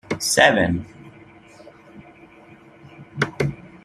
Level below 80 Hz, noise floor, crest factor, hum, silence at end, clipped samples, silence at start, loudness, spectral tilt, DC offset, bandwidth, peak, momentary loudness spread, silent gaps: -52 dBFS; -47 dBFS; 24 dB; none; 0.15 s; under 0.1%; 0.1 s; -19 LUFS; -3.5 dB/octave; under 0.1%; 14 kHz; 0 dBFS; 19 LU; none